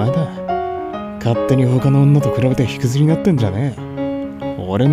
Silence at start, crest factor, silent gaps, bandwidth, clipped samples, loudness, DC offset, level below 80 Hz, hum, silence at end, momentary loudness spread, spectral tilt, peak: 0 s; 14 dB; none; 12.5 kHz; under 0.1%; -17 LUFS; under 0.1%; -44 dBFS; none; 0 s; 11 LU; -8 dB/octave; -2 dBFS